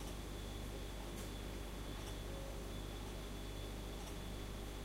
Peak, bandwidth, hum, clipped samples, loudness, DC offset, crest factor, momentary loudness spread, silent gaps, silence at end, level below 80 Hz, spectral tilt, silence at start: -34 dBFS; 16 kHz; 50 Hz at -50 dBFS; under 0.1%; -48 LUFS; under 0.1%; 12 dB; 1 LU; none; 0 s; -50 dBFS; -4.5 dB/octave; 0 s